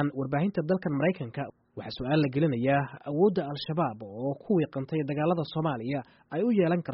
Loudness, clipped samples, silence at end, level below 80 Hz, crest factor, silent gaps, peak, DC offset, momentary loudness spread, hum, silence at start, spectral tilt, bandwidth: -29 LUFS; under 0.1%; 0 s; -62 dBFS; 16 dB; none; -12 dBFS; under 0.1%; 10 LU; none; 0 s; -6.5 dB/octave; 5.8 kHz